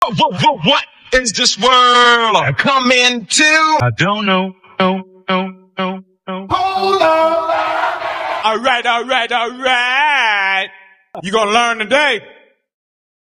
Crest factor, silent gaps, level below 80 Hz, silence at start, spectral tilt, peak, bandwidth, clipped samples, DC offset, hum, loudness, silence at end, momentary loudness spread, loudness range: 14 dB; none; -46 dBFS; 0 s; -3 dB/octave; 0 dBFS; 13.5 kHz; under 0.1%; under 0.1%; none; -13 LUFS; 0.9 s; 12 LU; 6 LU